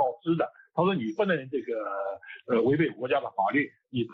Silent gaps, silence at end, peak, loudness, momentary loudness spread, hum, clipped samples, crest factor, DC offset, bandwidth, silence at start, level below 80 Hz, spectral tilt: none; 0 s; -12 dBFS; -28 LUFS; 8 LU; none; under 0.1%; 16 dB; under 0.1%; 6 kHz; 0 s; -72 dBFS; -8.5 dB/octave